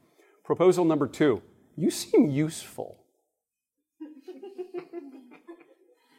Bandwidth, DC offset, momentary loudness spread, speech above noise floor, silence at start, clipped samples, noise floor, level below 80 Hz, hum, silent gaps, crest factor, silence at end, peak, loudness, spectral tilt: 16 kHz; under 0.1%; 23 LU; 61 dB; 0.5 s; under 0.1%; -86 dBFS; -72 dBFS; none; none; 18 dB; 0.65 s; -10 dBFS; -25 LUFS; -6 dB/octave